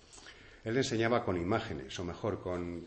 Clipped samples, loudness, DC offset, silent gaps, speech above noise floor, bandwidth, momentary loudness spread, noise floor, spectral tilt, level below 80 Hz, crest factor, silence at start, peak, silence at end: under 0.1%; -34 LUFS; under 0.1%; none; 20 dB; 8.8 kHz; 18 LU; -54 dBFS; -5.5 dB/octave; -58 dBFS; 18 dB; 0.1 s; -16 dBFS; 0 s